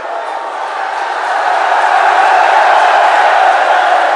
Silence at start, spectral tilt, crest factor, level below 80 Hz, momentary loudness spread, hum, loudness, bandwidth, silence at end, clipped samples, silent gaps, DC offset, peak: 0 s; 1.5 dB/octave; 10 dB; -80 dBFS; 11 LU; none; -10 LUFS; 11 kHz; 0 s; under 0.1%; none; under 0.1%; 0 dBFS